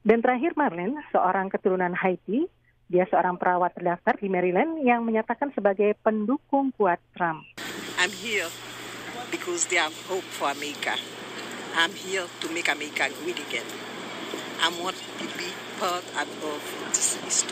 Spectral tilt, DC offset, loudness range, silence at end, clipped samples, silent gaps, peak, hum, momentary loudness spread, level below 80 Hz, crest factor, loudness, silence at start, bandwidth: -3 dB/octave; under 0.1%; 4 LU; 0 s; under 0.1%; none; -6 dBFS; none; 10 LU; -68 dBFS; 20 dB; -26 LUFS; 0.05 s; 15.5 kHz